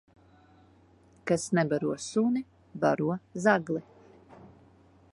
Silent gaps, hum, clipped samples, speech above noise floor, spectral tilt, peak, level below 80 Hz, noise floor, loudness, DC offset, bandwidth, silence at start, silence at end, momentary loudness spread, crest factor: none; none; under 0.1%; 32 dB; -6 dB/octave; -8 dBFS; -68 dBFS; -60 dBFS; -29 LUFS; under 0.1%; 11.5 kHz; 1.25 s; 0.65 s; 10 LU; 22 dB